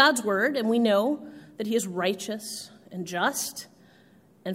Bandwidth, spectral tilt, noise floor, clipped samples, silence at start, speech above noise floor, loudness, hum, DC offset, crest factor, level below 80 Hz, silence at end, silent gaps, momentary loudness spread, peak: 16 kHz; -3.5 dB/octave; -57 dBFS; under 0.1%; 0 s; 31 dB; -26 LUFS; none; under 0.1%; 22 dB; -76 dBFS; 0 s; none; 16 LU; -4 dBFS